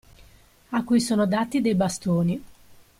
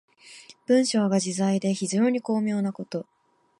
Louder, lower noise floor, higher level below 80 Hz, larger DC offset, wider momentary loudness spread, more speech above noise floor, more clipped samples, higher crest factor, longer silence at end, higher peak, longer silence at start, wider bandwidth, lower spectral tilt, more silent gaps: about the same, -24 LUFS vs -25 LUFS; first, -54 dBFS vs -49 dBFS; first, -56 dBFS vs -76 dBFS; neither; second, 7 LU vs 13 LU; first, 31 dB vs 26 dB; neither; about the same, 14 dB vs 16 dB; about the same, 0.5 s vs 0.6 s; about the same, -10 dBFS vs -10 dBFS; first, 0.7 s vs 0.25 s; first, 15.5 kHz vs 11.5 kHz; about the same, -6 dB/octave vs -5.5 dB/octave; neither